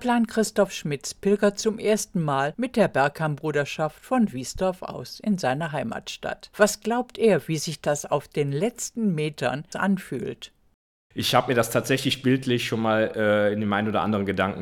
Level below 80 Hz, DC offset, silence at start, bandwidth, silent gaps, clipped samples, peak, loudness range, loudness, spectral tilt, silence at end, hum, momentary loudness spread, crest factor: -56 dBFS; under 0.1%; 0 s; 18.5 kHz; 10.74-11.10 s; under 0.1%; -4 dBFS; 4 LU; -25 LUFS; -5 dB/octave; 0 s; none; 9 LU; 20 dB